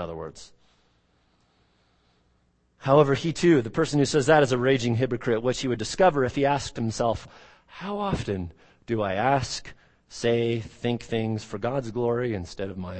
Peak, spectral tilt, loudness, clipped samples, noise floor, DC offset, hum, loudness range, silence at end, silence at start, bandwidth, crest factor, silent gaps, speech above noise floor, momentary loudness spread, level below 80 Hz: -4 dBFS; -5.5 dB/octave; -25 LUFS; under 0.1%; -67 dBFS; under 0.1%; none; 6 LU; 0 s; 0 s; 8.8 kHz; 22 dB; none; 42 dB; 14 LU; -50 dBFS